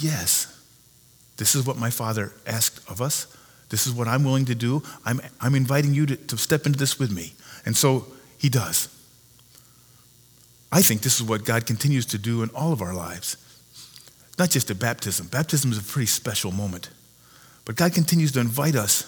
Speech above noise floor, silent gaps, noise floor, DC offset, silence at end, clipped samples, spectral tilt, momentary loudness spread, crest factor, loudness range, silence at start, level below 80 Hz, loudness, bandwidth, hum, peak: 31 dB; none; -55 dBFS; under 0.1%; 0 s; under 0.1%; -4 dB/octave; 11 LU; 20 dB; 3 LU; 0 s; -60 dBFS; -23 LUFS; over 20 kHz; none; -4 dBFS